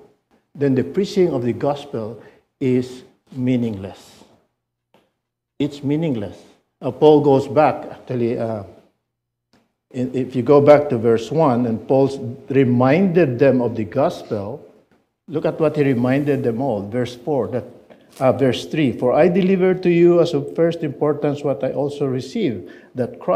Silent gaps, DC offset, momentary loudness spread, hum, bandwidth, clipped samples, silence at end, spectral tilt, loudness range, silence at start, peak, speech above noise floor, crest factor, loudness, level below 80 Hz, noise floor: none; under 0.1%; 15 LU; none; 12.5 kHz; under 0.1%; 0 s; -8 dB/octave; 9 LU; 0.55 s; 0 dBFS; 60 dB; 18 dB; -18 LUFS; -58 dBFS; -78 dBFS